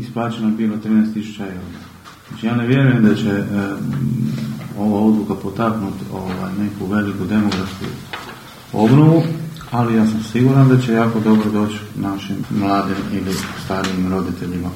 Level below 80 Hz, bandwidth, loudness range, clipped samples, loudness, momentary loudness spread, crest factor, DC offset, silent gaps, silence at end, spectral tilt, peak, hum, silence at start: -50 dBFS; 16 kHz; 6 LU; under 0.1%; -18 LUFS; 14 LU; 18 dB; under 0.1%; none; 0 s; -7.5 dB/octave; 0 dBFS; none; 0 s